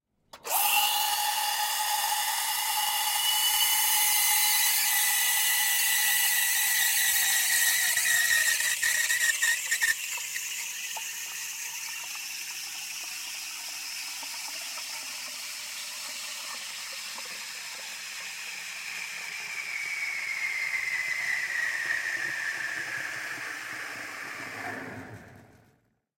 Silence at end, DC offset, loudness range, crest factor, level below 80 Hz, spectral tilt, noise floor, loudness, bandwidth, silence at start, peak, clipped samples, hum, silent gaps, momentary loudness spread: 0.7 s; under 0.1%; 13 LU; 18 dB; -74 dBFS; 2.5 dB/octave; -68 dBFS; -26 LUFS; 16.5 kHz; 0.35 s; -10 dBFS; under 0.1%; none; none; 14 LU